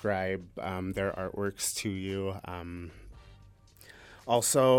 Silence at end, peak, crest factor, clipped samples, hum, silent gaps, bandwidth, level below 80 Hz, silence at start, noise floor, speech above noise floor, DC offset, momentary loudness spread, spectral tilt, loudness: 0 s; -12 dBFS; 20 dB; under 0.1%; none; none; 17.5 kHz; -58 dBFS; 0 s; -56 dBFS; 26 dB; under 0.1%; 21 LU; -4 dB/octave; -32 LUFS